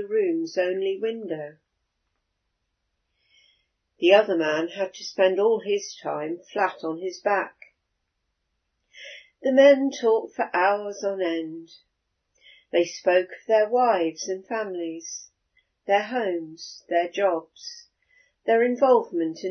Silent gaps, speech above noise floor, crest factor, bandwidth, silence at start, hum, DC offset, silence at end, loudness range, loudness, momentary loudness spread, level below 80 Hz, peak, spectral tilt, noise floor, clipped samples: none; 54 dB; 20 dB; 6.6 kHz; 0 s; none; under 0.1%; 0 s; 7 LU; -24 LUFS; 18 LU; -80 dBFS; -4 dBFS; -3.5 dB/octave; -77 dBFS; under 0.1%